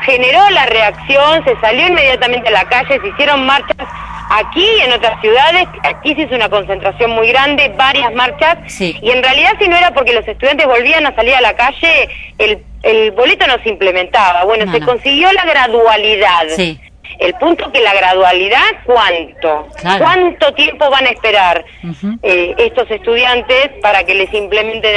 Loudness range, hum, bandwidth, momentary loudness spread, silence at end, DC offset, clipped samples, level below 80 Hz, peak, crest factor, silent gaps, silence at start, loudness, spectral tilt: 2 LU; none; 11 kHz; 7 LU; 0 s; under 0.1%; under 0.1%; -36 dBFS; 0 dBFS; 10 dB; none; 0 s; -10 LUFS; -4 dB/octave